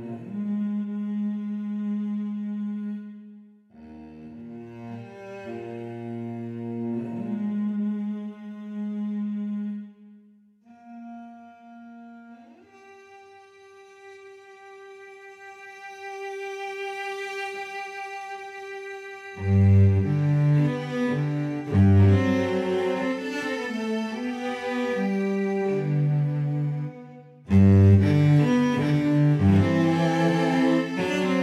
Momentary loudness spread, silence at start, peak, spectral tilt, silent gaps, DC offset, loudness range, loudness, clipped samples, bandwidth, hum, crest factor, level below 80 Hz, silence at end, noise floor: 23 LU; 0 s; -8 dBFS; -8 dB/octave; none; under 0.1%; 18 LU; -24 LUFS; under 0.1%; 8.8 kHz; none; 18 dB; -60 dBFS; 0 s; -56 dBFS